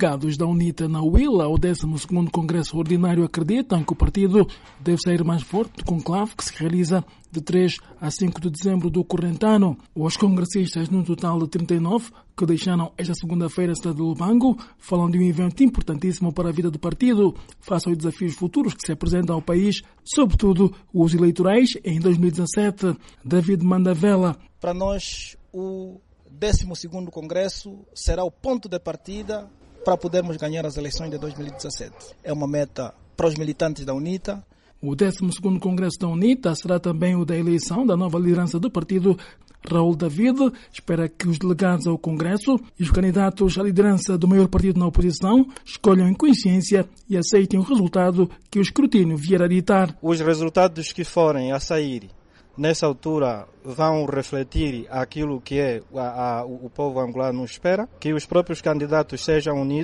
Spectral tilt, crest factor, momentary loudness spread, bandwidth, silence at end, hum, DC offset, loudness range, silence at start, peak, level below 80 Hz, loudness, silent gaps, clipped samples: -6.5 dB/octave; 16 dB; 11 LU; 11.5 kHz; 0 s; none; under 0.1%; 8 LU; 0 s; -6 dBFS; -36 dBFS; -22 LUFS; none; under 0.1%